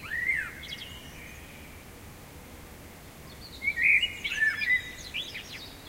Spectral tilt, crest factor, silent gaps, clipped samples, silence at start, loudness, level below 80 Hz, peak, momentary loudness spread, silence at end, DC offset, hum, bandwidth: -1.5 dB/octave; 22 dB; none; under 0.1%; 0 s; -27 LUFS; -54 dBFS; -10 dBFS; 24 LU; 0 s; under 0.1%; none; 16 kHz